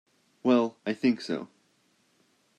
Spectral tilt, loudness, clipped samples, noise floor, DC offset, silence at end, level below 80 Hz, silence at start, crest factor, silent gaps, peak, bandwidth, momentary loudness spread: -6 dB/octave; -28 LUFS; under 0.1%; -69 dBFS; under 0.1%; 1.1 s; -80 dBFS; 0.45 s; 20 dB; none; -10 dBFS; 9.2 kHz; 11 LU